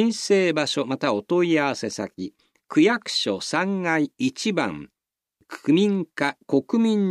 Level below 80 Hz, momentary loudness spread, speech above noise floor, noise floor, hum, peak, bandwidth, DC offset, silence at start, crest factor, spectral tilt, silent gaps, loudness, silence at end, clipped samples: -70 dBFS; 11 LU; 47 dB; -70 dBFS; none; -6 dBFS; 12.5 kHz; under 0.1%; 0 s; 16 dB; -5 dB/octave; none; -23 LUFS; 0 s; under 0.1%